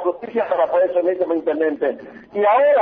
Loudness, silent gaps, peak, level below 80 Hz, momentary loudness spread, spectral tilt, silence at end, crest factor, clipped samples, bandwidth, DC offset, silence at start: -19 LUFS; none; -6 dBFS; -66 dBFS; 8 LU; -3 dB/octave; 0 s; 12 dB; under 0.1%; 4.6 kHz; under 0.1%; 0 s